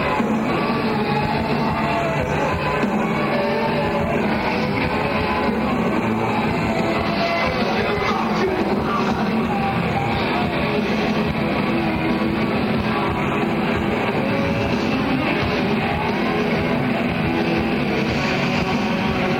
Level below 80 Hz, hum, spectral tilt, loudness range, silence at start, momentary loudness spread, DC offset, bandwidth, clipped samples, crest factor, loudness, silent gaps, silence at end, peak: -38 dBFS; none; -6.5 dB/octave; 0 LU; 0 s; 1 LU; under 0.1%; 16.5 kHz; under 0.1%; 14 dB; -20 LUFS; none; 0 s; -6 dBFS